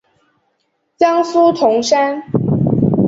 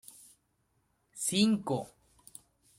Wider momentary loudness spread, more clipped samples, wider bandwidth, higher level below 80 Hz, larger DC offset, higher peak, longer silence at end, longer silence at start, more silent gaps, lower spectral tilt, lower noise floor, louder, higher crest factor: second, 5 LU vs 25 LU; neither; second, 8 kHz vs 16 kHz; first, -46 dBFS vs -72 dBFS; neither; first, -2 dBFS vs -14 dBFS; second, 0 s vs 0.9 s; second, 1 s vs 1.15 s; neither; first, -6.5 dB/octave vs -4 dB/octave; second, -66 dBFS vs -75 dBFS; first, -14 LUFS vs -30 LUFS; second, 14 dB vs 22 dB